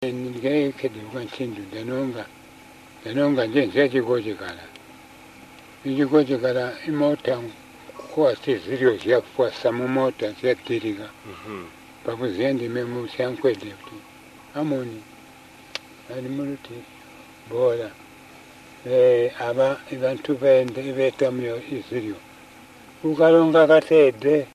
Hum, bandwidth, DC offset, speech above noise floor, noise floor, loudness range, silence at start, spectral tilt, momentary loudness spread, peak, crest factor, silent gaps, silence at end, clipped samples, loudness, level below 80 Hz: none; 14 kHz; under 0.1%; 25 dB; -47 dBFS; 8 LU; 0 s; -6.5 dB/octave; 20 LU; -4 dBFS; 18 dB; none; 0.05 s; under 0.1%; -22 LUFS; -64 dBFS